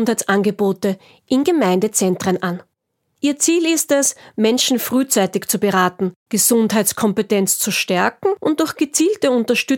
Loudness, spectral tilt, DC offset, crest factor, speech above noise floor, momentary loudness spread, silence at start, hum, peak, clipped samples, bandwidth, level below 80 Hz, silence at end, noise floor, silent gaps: -17 LUFS; -3.5 dB/octave; under 0.1%; 16 dB; 54 dB; 6 LU; 0 s; none; -2 dBFS; under 0.1%; 17 kHz; -64 dBFS; 0 s; -71 dBFS; 6.16-6.26 s